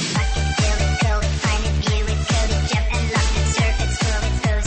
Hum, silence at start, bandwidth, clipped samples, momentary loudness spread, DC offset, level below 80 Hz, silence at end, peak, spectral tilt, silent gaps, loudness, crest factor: none; 0 s; 8.8 kHz; under 0.1%; 2 LU; under 0.1%; -22 dBFS; 0 s; -8 dBFS; -4.5 dB/octave; none; -20 LUFS; 12 dB